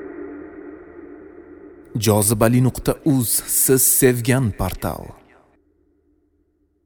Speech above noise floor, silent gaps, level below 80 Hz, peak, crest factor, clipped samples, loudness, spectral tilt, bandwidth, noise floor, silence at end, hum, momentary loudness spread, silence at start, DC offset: 46 dB; none; -42 dBFS; -2 dBFS; 20 dB; under 0.1%; -17 LUFS; -4.5 dB/octave; 19.5 kHz; -64 dBFS; 1.75 s; none; 25 LU; 0 s; under 0.1%